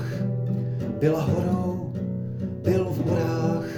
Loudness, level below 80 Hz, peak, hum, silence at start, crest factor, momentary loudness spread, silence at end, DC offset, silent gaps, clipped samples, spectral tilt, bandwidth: -26 LUFS; -56 dBFS; -10 dBFS; none; 0 s; 16 dB; 6 LU; 0 s; under 0.1%; none; under 0.1%; -8.5 dB/octave; 18 kHz